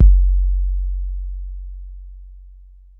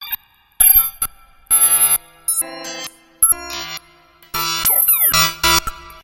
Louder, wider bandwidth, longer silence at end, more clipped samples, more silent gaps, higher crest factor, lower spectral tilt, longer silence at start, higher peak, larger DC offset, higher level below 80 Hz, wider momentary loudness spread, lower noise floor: second, -22 LUFS vs -13 LUFS; second, 0.3 kHz vs 17 kHz; first, 0.5 s vs 0.1 s; neither; neither; about the same, 16 dB vs 18 dB; first, -14 dB/octave vs 0 dB/octave; about the same, 0 s vs 0 s; about the same, -2 dBFS vs 0 dBFS; neither; first, -18 dBFS vs -40 dBFS; first, 23 LU vs 18 LU; second, -43 dBFS vs -49 dBFS